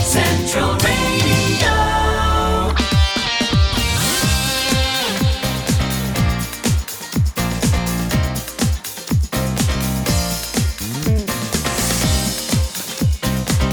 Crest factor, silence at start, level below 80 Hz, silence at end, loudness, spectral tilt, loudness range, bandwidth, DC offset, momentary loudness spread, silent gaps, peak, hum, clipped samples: 14 dB; 0 s; -24 dBFS; 0 s; -18 LUFS; -4 dB/octave; 4 LU; over 20 kHz; under 0.1%; 5 LU; none; -4 dBFS; none; under 0.1%